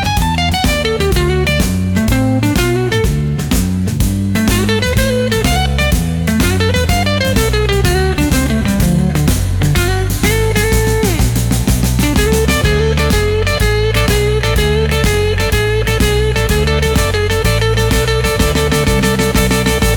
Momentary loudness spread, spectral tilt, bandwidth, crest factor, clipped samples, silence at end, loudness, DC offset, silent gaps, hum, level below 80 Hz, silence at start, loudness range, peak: 2 LU; -5 dB/octave; 19 kHz; 10 dB; under 0.1%; 0 s; -13 LUFS; under 0.1%; none; none; -20 dBFS; 0 s; 1 LU; -2 dBFS